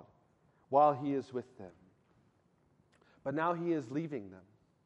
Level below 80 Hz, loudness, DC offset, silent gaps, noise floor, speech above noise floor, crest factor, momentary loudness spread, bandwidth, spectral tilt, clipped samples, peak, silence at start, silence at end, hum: -80 dBFS; -34 LUFS; under 0.1%; none; -71 dBFS; 38 dB; 22 dB; 25 LU; 8.4 kHz; -8 dB/octave; under 0.1%; -16 dBFS; 0.7 s; 0.45 s; none